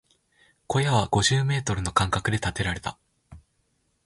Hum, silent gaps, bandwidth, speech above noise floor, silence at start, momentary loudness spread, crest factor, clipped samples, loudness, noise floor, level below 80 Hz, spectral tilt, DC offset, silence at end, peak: none; none; 11.5 kHz; 47 dB; 0.7 s; 7 LU; 22 dB; under 0.1%; -25 LUFS; -71 dBFS; -44 dBFS; -4.5 dB/octave; under 0.1%; 0.65 s; -4 dBFS